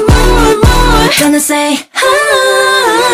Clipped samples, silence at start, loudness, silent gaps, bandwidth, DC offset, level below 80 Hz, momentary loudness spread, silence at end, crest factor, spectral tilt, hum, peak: 0.4%; 0 s; -8 LUFS; none; 16 kHz; under 0.1%; -14 dBFS; 3 LU; 0 s; 8 dB; -4 dB/octave; none; 0 dBFS